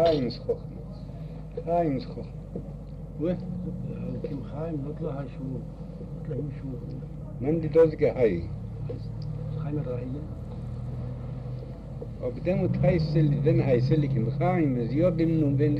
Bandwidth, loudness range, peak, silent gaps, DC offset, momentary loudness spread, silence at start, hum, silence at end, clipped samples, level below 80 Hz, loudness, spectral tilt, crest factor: 6 kHz; 10 LU; -10 dBFS; none; under 0.1%; 15 LU; 0 s; none; 0 s; under 0.1%; -42 dBFS; -28 LUFS; -10 dB/octave; 18 dB